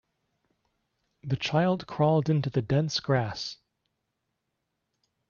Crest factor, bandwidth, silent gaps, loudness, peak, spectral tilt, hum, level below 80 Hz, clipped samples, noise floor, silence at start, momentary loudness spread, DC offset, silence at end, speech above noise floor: 18 dB; 7.2 kHz; none; -27 LUFS; -12 dBFS; -6.5 dB/octave; none; -62 dBFS; under 0.1%; -81 dBFS; 1.25 s; 10 LU; under 0.1%; 1.75 s; 55 dB